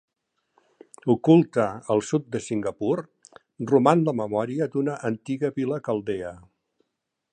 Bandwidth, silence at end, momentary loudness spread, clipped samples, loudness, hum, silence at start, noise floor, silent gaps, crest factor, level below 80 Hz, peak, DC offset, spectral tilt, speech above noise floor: 9.8 kHz; 0.95 s; 12 LU; under 0.1%; -24 LUFS; none; 1.05 s; -81 dBFS; none; 22 dB; -64 dBFS; -4 dBFS; under 0.1%; -7.5 dB/octave; 57 dB